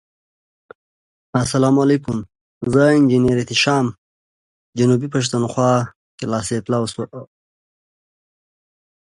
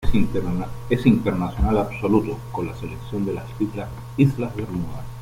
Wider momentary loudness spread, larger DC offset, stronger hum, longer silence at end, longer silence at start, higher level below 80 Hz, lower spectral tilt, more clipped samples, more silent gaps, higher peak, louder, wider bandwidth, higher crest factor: first, 15 LU vs 11 LU; neither; neither; first, 1.95 s vs 0 s; first, 1.35 s vs 0 s; second, -50 dBFS vs -32 dBFS; second, -5.5 dB/octave vs -8.5 dB/octave; neither; first, 2.41-2.61 s, 3.98-4.73 s, 5.96-6.18 s vs none; about the same, -2 dBFS vs -4 dBFS; first, -18 LUFS vs -24 LUFS; second, 11.5 kHz vs 16 kHz; about the same, 18 dB vs 18 dB